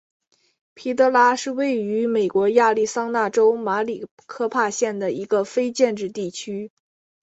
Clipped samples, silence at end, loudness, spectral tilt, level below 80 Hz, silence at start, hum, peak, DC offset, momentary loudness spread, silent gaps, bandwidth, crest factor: under 0.1%; 0.55 s; -21 LUFS; -4 dB/octave; -68 dBFS; 0.75 s; none; -4 dBFS; under 0.1%; 13 LU; 4.11-4.17 s; 8.2 kHz; 18 dB